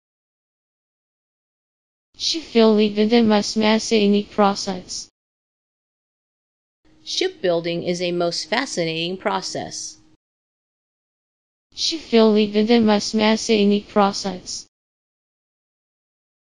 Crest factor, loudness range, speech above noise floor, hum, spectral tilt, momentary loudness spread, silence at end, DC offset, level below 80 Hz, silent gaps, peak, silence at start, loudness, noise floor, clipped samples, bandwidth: 18 dB; 8 LU; over 71 dB; none; -4.5 dB/octave; 13 LU; 1.95 s; 0.3%; -60 dBFS; 5.11-6.83 s, 10.16-11.70 s; -2 dBFS; 2.2 s; -19 LUFS; under -90 dBFS; under 0.1%; 10.5 kHz